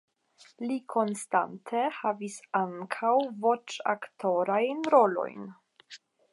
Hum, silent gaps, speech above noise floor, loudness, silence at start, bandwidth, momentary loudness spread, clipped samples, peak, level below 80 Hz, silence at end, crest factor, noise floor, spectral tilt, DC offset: none; none; 25 dB; -29 LUFS; 0.6 s; 11.5 kHz; 14 LU; under 0.1%; -8 dBFS; -88 dBFS; 0.35 s; 22 dB; -54 dBFS; -5 dB/octave; under 0.1%